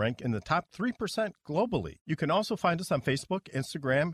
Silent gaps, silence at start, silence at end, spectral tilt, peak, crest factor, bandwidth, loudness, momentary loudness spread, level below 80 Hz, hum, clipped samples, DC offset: 2.01-2.05 s; 0 s; 0 s; -6 dB/octave; -14 dBFS; 16 dB; 14.5 kHz; -31 LUFS; 6 LU; -58 dBFS; none; under 0.1%; under 0.1%